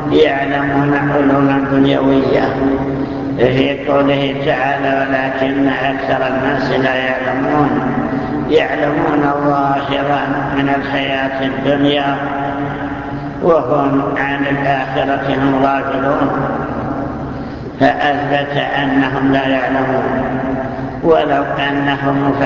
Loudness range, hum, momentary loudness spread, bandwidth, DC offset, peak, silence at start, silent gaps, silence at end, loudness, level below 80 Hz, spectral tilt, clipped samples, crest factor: 2 LU; none; 6 LU; 7 kHz; under 0.1%; 0 dBFS; 0 s; none; 0 s; -15 LUFS; -38 dBFS; -7.5 dB/octave; under 0.1%; 14 dB